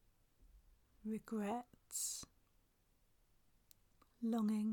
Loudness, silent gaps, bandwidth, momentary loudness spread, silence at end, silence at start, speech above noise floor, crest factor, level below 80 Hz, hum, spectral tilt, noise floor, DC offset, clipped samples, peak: -43 LUFS; none; 19 kHz; 11 LU; 0 s; 0.4 s; 35 dB; 16 dB; -74 dBFS; none; -4.5 dB/octave; -76 dBFS; under 0.1%; under 0.1%; -30 dBFS